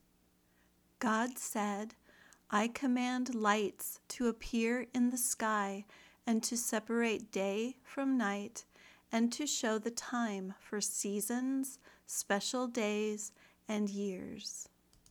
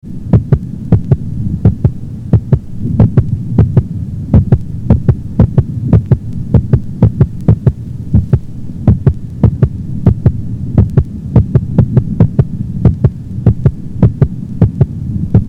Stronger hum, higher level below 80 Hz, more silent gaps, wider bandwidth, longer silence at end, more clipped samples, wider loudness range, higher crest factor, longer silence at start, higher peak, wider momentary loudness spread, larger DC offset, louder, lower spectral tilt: neither; second, -68 dBFS vs -22 dBFS; neither; first, over 20 kHz vs 3.4 kHz; first, 0.45 s vs 0 s; second, under 0.1% vs 2%; about the same, 3 LU vs 1 LU; first, 20 dB vs 12 dB; first, 1 s vs 0.05 s; second, -16 dBFS vs 0 dBFS; first, 10 LU vs 5 LU; neither; second, -36 LUFS vs -13 LUFS; second, -3.5 dB/octave vs -11.5 dB/octave